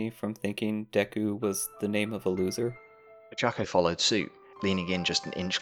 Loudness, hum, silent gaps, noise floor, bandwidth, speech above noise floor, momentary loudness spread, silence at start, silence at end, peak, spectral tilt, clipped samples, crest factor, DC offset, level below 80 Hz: -29 LUFS; none; none; -52 dBFS; 18.5 kHz; 22 dB; 8 LU; 0 s; 0 s; -10 dBFS; -4 dB/octave; under 0.1%; 20 dB; under 0.1%; -64 dBFS